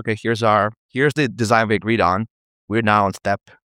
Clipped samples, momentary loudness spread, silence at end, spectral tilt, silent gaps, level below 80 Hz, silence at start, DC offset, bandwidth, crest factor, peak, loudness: under 0.1%; 8 LU; 0.3 s; -6 dB/octave; 0.77-0.89 s, 2.30-2.68 s; -54 dBFS; 0 s; under 0.1%; 16 kHz; 18 dB; -2 dBFS; -19 LUFS